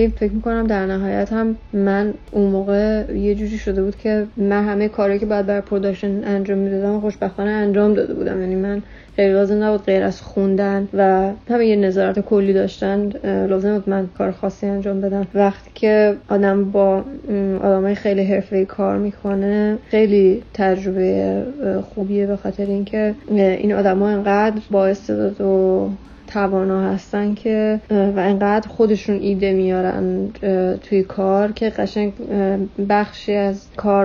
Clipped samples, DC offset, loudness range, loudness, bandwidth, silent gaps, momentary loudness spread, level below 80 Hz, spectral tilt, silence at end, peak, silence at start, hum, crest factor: under 0.1%; under 0.1%; 2 LU; -18 LUFS; 6.8 kHz; none; 6 LU; -40 dBFS; -8.5 dB/octave; 0 s; -2 dBFS; 0 s; none; 14 dB